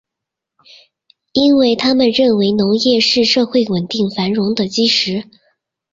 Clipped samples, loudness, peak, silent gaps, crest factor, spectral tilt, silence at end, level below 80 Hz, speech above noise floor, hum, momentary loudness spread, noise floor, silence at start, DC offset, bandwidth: under 0.1%; -14 LUFS; -2 dBFS; none; 14 dB; -5 dB/octave; 0.7 s; -54 dBFS; 68 dB; none; 6 LU; -82 dBFS; 1.35 s; under 0.1%; 7.8 kHz